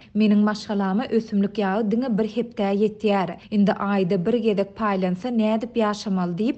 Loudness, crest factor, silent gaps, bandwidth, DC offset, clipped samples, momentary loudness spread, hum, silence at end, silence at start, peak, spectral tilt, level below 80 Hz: -23 LUFS; 14 dB; none; 8.2 kHz; under 0.1%; under 0.1%; 4 LU; none; 0 s; 0.15 s; -8 dBFS; -7.5 dB/octave; -58 dBFS